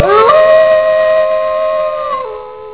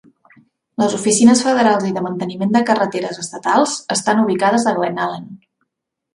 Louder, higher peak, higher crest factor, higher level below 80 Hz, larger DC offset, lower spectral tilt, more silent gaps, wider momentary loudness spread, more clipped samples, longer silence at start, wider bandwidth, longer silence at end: first, -10 LUFS vs -16 LUFS; about the same, 0 dBFS vs 0 dBFS; second, 10 dB vs 18 dB; first, -46 dBFS vs -62 dBFS; first, 0.7% vs under 0.1%; first, -7.5 dB/octave vs -4 dB/octave; neither; about the same, 13 LU vs 12 LU; first, 0.3% vs under 0.1%; second, 0 s vs 0.8 s; second, 4 kHz vs 11.5 kHz; second, 0 s vs 0.8 s